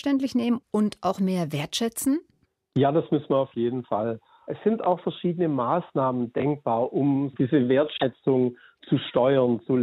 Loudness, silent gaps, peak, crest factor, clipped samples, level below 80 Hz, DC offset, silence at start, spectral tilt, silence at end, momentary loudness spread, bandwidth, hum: -25 LUFS; none; -8 dBFS; 16 dB; under 0.1%; -66 dBFS; under 0.1%; 0.05 s; -6.5 dB/octave; 0 s; 6 LU; 16 kHz; none